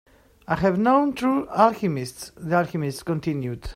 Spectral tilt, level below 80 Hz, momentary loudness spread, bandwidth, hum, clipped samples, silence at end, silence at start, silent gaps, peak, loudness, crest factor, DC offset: -6.5 dB/octave; -46 dBFS; 10 LU; 16 kHz; none; under 0.1%; 0 s; 0.5 s; none; -4 dBFS; -23 LUFS; 20 dB; under 0.1%